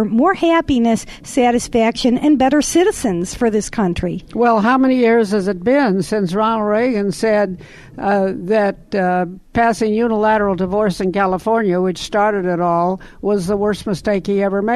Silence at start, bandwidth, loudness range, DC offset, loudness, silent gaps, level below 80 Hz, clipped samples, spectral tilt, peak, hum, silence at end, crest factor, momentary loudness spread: 0 s; 13 kHz; 2 LU; under 0.1%; -16 LUFS; none; -40 dBFS; under 0.1%; -5.5 dB/octave; -2 dBFS; none; 0 s; 14 dB; 6 LU